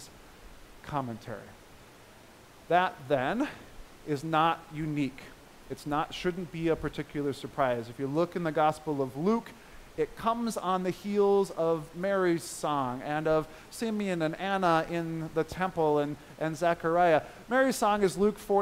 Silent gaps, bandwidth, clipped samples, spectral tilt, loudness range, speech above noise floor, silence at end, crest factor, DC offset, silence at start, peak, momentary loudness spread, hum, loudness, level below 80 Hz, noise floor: none; 16 kHz; under 0.1%; -5.5 dB/octave; 5 LU; 24 dB; 0 s; 20 dB; under 0.1%; 0 s; -10 dBFS; 10 LU; none; -30 LUFS; -56 dBFS; -54 dBFS